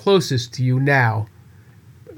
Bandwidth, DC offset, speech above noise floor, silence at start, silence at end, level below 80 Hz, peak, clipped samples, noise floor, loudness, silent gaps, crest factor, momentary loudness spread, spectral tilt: 16.5 kHz; under 0.1%; 29 dB; 0 s; 0 s; -60 dBFS; -4 dBFS; under 0.1%; -46 dBFS; -19 LUFS; none; 16 dB; 10 LU; -6 dB/octave